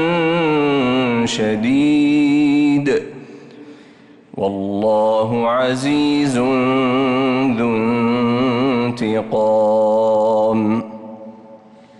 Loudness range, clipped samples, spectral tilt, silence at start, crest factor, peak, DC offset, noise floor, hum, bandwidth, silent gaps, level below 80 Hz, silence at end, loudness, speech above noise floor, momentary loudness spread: 3 LU; under 0.1%; -6 dB/octave; 0 s; 8 dB; -8 dBFS; under 0.1%; -45 dBFS; none; 11 kHz; none; -54 dBFS; 0.45 s; -16 LUFS; 29 dB; 7 LU